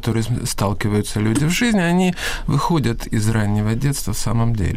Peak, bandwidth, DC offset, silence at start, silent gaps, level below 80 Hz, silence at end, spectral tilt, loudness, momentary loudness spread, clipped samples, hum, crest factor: -8 dBFS; 16 kHz; under 0.1%; 0 s; none; -30 dBFS; 0 s; -5.5 dB/octave; -19 LUFS; 5 LU; under 0.1%; none; 10 dB